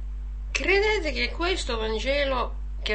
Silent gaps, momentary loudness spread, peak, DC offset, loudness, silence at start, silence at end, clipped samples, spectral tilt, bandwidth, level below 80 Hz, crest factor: none; 11 LU; -6 dBFS; 0.4%; -25 LUFS; 0 s; 0 s; under 0.1%; -4 dB/octave; 8.8 kHz; -32 dBFS; 20 dB